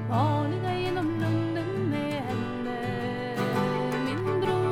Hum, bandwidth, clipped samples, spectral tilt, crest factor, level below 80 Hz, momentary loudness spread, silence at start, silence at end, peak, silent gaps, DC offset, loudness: none; 14.5 kHz; under 0.1%; -7.5 dB/octave; 16 dB; -54 dBFS; 5 LU; 0 s; 0 s; -12 dBFS; none; under 0.1%; -28 LUFS